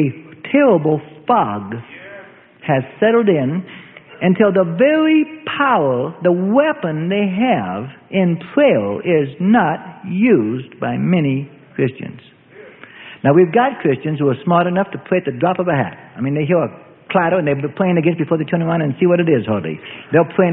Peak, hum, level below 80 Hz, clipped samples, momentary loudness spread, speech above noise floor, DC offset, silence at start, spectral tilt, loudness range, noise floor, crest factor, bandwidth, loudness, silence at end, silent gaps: 0 dBFS; none; -58 dBFS; under 0.1%; 12 LU; 25 dB; under 0.1%; 0 s; -12.5 dB/octave; 3 LU; -40 dBFS; 16 dB; 3.9 kHz; -16 LUFS; 0 s; none